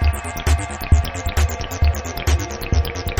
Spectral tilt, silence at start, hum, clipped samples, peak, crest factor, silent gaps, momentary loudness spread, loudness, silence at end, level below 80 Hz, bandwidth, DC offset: -5 dB/octave; 0 s; none; under 0.1%; -2 dBFS; 18 dB; none; 4 LU; -21 LUFS; 0 s; -22 dBFS; over 20 kHz; under 0.1%